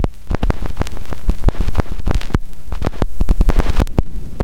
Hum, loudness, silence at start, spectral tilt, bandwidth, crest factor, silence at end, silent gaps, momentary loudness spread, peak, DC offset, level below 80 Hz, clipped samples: none; -21 LUFS; 0 s; -7 dB/octave; 14.5 kHz; 16 dB; 0 s; none; 8 LU; 0 dBFS; 20%; -18 dBFS; under 0.1%